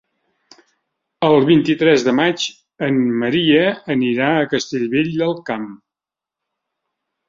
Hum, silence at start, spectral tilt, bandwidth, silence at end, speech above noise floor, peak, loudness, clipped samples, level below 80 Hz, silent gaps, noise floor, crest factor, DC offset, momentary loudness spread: none; 1.2 s; -5.5 dB/octave; 7.6 kHz; 1.55 s; 71 dB; -2 dBFS; -17 LUFS; under 0.1%; -58 dBFS; none; -87 dBFS; 16 dB; under 0.1%; 11 LU